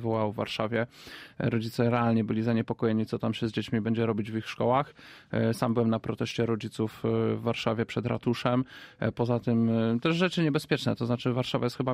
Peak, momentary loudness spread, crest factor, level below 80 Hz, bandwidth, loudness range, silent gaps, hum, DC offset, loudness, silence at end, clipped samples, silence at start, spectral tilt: -12 dBFS; 6 LU; 16 dB; -60 dBFS; 15 kHz; 2 LU; none; none; under 0.1%; -29 LUFS; 0 s; under 0.1%; 0 s; -7 dB/octave